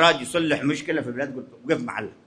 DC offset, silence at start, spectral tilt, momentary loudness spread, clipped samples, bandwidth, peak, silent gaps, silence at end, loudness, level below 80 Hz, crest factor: under 0.1%; 0 s; -4 dB/octave; 9 LU; under 0.1%; 11 kHz; -4 dBFS; none; 0.15 s; -25 LUFS; -64 dBFS; 20 dB